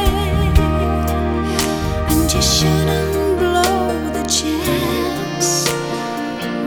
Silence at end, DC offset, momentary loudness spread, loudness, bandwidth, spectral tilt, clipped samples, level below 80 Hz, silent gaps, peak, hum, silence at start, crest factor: 0 s; under 0.1%; 7 LU; -17 LUFS; over 20 kHz; -4.5 dB/octave; under 0.1%; -24 dBFS; none; 0 dBFS; none; 0 s; 16 dB